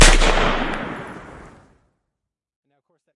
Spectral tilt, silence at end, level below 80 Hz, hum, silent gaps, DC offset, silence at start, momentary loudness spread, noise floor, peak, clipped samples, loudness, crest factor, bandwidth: -2.5 dB/octave; 1.95 s; -22 dBFS; none; none; under 0.1%; 0 s; 23 LU; -81 dBFS; 0 dBFS; under 0.1%; -19 LUFS; 20 dB; 11.5 kHz